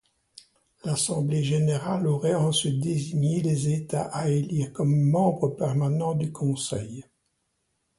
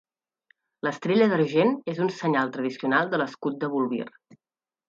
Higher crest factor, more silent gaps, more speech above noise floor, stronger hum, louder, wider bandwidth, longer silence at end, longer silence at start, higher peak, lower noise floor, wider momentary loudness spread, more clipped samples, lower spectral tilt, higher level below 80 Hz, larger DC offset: about the same, 16 dB vs 18 dB; neither; first, 50 dB vs 42 dB; neither; about the same, -25 LUFS vs -25 LUFS; first, 11.5 kHz vs 7.6 kHz; first, 1 s vs 0.8 s; about the same, 0.85 s vs 0.85 s; about the same, -10 dBFS vs -8 dBFS; first, -75 dBFS vs -67 dBFS; about the same, 7 LU vs 9 LU; neither; about the same, -6 dB/octave vs -7 dB/octave; first, -60 dBFS vs -76 dBFS; neither